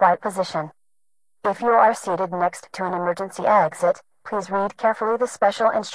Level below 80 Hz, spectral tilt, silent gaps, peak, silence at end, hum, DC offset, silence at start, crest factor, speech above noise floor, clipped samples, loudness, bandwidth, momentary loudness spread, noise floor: -64 dBFS; -4.5 dB/octave; none; -4 dBFS; 0 s; none; under 0.1%; 0 s; 18 dB; 59 dB; under 0.1%; -22 LUFS; 11 kHz; 11 LU; -80 dBFS